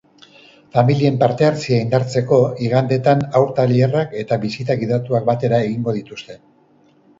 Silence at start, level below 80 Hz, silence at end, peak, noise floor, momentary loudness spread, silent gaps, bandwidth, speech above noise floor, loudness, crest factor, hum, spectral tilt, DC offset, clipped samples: 0.75 s; -56 dBFS; 0.85 s; 0 dBFS; -54 dBFS; 6 LU; none; 7.8 kHz; 37 dB; -17 LUFS; 18 dB; none; -7.5 dB/octave; under 0.1%; under 0.1%